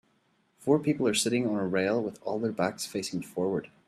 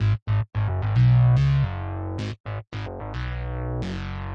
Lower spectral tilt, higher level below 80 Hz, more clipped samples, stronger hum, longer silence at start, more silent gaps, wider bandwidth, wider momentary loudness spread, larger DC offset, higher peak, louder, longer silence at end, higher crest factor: second, -4.5 dB/octave vs -8.5 dB/octave; second, -70 dBFS vs -36 dBFS; neither; neither; first, 0.6 s vs 0 s; second, none vs 0.22-0.26 s, 2.40-2.44 s; first, 14.5 kHz vs 6.4 kHz; second, 8 LU vs 15 LU; neither; about the same, -12 dBFS vs -10 dBFS; second, -29 LUFS vs -24 LUFS; first, 0.2 s vs 0 s; first, 18 dB vs 12 dB